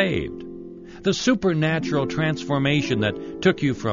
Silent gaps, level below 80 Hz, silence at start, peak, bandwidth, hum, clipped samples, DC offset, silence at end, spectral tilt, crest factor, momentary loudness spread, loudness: none; -48 dBFS; 0 s; -6 dBFS; 7.4 kHz; none; under 0.1%; under 0.1%; 0 s; -5 dB/octave; 16 dB; 14 LU; -22 LUFS